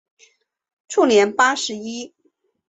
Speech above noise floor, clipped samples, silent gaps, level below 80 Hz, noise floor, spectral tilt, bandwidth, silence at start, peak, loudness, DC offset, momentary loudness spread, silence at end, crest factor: 48 dB; under 0.1%; none; -68 dBFS; -66 dBFS; -2.5 dB/octave; 8.4 kHz; 0.9 s; -4 dBFS; -18 LUFS; under 0.1%; 17 LU; 0.6 s; 18 dB